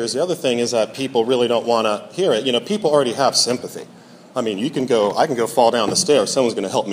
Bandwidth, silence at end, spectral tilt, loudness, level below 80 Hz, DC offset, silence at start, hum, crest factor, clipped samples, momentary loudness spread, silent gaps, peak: 15.5 kHz; 0 s; -3.5 dB/octave; -18 LUFS; -66 dBFS; under 0.1%; 0 s; none; 18 dB; under 0.1%; 7 LU; none; 0 dBFS